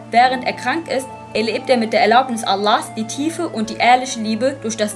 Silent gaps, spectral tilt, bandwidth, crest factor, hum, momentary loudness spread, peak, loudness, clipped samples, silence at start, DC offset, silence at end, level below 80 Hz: none; -3.5 dB/octave; 13 kHz; 16 dB; none; 9 LU; -2 dBFS; -18 LUFS; under 0.1%; 0 s; under 0.1%; 0 s; -60 dBFS